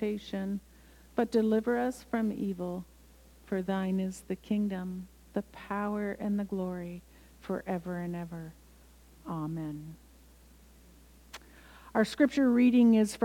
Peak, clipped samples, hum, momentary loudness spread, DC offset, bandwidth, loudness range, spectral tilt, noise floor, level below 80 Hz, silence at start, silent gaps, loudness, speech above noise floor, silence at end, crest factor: -12 dBFS; under 0.1%; none; 20 LU; under 0.1%; 16.5 kHz; 10 LU; -7 dB/octave; -57 dBFS; -58 dBFS; 0 s; none; -31 LUFS; 27 dB; 0 s; 20 dB